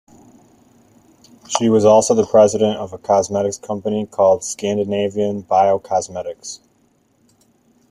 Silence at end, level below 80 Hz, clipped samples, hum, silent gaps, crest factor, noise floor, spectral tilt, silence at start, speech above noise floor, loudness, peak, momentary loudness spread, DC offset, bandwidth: 1.35 s; -58 dBFS; under 0.1%; none; none; 18 dB; -59 dBFS; -5 dB/octave; 1.5 s; 43 dB; -17 LUFS; -2 dBFS; 15 LU; under 0.1%; 12.5 kHz